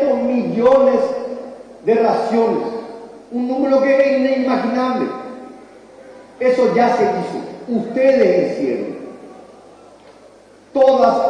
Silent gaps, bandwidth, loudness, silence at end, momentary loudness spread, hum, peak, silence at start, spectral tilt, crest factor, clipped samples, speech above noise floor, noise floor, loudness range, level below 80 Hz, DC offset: none; 9.6 kHz; -16 LUFS; 0 s; 18 LU; none; -2 dBFS; 0 s; -6.5 dB/octave; 14 dB; under 0.1%; 30 dB; -45 dBFS; 3 LU; -58 dBFS; under 0.1%